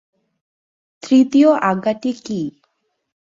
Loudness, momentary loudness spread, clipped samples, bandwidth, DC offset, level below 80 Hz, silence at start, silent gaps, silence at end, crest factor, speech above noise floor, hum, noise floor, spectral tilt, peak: -16 LUFS; 13 LU; under 0.1%; 7.6 kHz; under 0.1%; -64 dBFS; 1.05 s; none; 0.85 s; 16 dB; 52 dB; none; -67 dBFS; -6 dB/octave; -2 dBFS